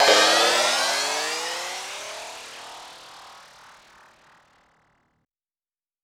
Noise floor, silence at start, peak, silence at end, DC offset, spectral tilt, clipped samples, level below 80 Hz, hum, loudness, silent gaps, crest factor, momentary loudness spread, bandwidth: under -90 dBFS; 0 s; -4 dBFS; 2.65 s; under 0.1%; 1 dB/octave; under 0.1%; -72 dBFS; none; -21 LUFS; none; 22 dB; 26 LU; 19.5 kHz